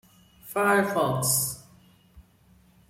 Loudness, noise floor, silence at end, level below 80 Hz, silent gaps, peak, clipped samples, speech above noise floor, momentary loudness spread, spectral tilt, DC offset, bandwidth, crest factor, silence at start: -24 LUFS; -59 dBFS; 0.7 s; -60 dBFS; none; -10 dBFS; under 0.1%; 35 dB; 10 LU; -3.5 dB/octave; under 0.1%; 16.5 kHz; 18 dB; 0.45 s